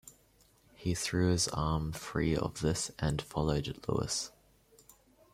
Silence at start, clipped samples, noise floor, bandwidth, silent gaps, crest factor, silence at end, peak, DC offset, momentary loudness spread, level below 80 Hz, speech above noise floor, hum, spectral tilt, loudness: 0.05 s; under 0.1%; -66 dBFS; 16 kHz; none; 18 dB; 1.05 s; -16 dBFS; under 0.1%; 6 LU; -50 dBFS; 33 dB; none; -4.5 dB/octave; -33 LUFS